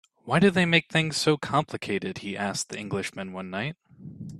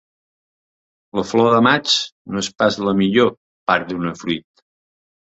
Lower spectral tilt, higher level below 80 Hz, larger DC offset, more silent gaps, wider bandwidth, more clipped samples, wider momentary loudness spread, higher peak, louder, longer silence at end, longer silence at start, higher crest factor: about the same, -4.5 dB/octave vs -4.5 dB/octave; second, -62 dBFS vs -56 dBFS; neither; second, none vs 2.12-2.25 s, 3.37-3.66 s; first, 13 kHz vs 8 kHz; neither; about the same, 14 LU vs 12 LU; second, -6 dBFS vs 0 dBFS; second, -26 LUFS vs -18 LUFS; second, 0 s vs 1 s; second, 0.25 s vs 1.15 s; about the same, 20 dB vs 18 dB